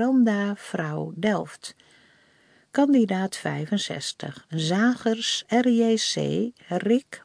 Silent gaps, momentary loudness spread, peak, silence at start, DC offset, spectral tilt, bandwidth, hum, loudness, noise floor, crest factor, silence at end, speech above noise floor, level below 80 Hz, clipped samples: none; 10 LU; -8 dBFS; 0 s; under 0.1%; -5 dB/octave; 10.5 kHz; none; -24 LUFS; -60 dBFS; 18 dB; 0.05 s; 36 dB; -70 dBFS; under 0.1%